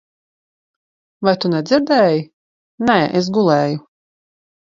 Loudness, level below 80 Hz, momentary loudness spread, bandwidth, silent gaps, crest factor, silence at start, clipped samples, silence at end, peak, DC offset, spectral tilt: -16 LUFS; -58 dBFS; 8 LU; 7.6 kHz; 2.33-2.78 s; 18 dB; 1.2 s; under 0.1%; 0.9 s; 0 dBFS; under 0.1%; -6.5 dB/octave